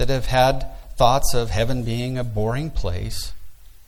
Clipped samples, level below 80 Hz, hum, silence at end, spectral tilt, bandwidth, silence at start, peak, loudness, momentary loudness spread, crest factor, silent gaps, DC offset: under 0.1%; -30 dBFS; none; 0.05 s; -5 dB/octave; 16 kHz; 0 s; -2 dBFS; -22 LUFS; 12 LU; 18 dB; none; under 0.1%